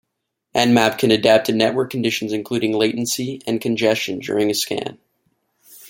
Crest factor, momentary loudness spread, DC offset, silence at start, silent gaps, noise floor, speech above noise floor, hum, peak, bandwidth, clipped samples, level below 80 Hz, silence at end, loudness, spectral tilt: 18 dB; 9 LU; under 0.1%; 0.55 s; none; -77 dBFS; 58 dB; none; -2 dBFS; 17 kHz; under 0.1%; -60 dBFS; 0 s; -19 LUFS; -4 dB/octave